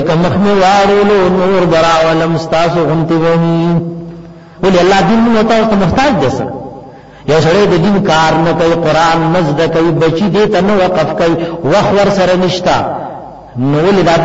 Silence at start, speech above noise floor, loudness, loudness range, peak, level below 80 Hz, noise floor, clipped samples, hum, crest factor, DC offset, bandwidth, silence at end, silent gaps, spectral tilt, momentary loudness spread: 0 s; 23 dB; -10 LUFS; 2 LU; 0 dBFS; -34 dBFS; -32 dBFS; under 0.1%; none; 10 dB; under 0.1%; 8 kHz; 0 s; none; -6 dB/octave; 8 LU